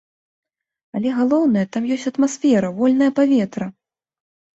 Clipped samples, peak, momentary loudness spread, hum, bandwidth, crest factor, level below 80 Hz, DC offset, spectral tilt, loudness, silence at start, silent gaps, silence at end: under 0.1%; -6 dBFS; 9 LU; none; 8 kHz; 14 dB; -62 dBFS; under 0.1%; -6 dB/octave; -18 LUFS; 0.95 s; none; 0.85 s